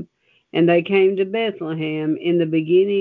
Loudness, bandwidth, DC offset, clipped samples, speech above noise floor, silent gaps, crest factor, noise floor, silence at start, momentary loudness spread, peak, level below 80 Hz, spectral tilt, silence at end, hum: -19 LUFS; 4.2 kHz; under 0.1%; under 0.1%; 36 dB; none; 14 dB; -54 dBFS; 0 s; 8 LU; -4 dBFS; -68 dBFS; -10 dB/octave; 0 s; none